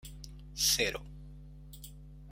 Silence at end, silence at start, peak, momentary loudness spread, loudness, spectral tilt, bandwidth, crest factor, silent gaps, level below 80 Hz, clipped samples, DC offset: 0 s; 0.05 s; -16 dBFS; 25 LU; -29 LUFS; -1 dB/octave; 16.5 kHz; 22 dB; none; -50 dBFS; under 0.1%; under 0.1%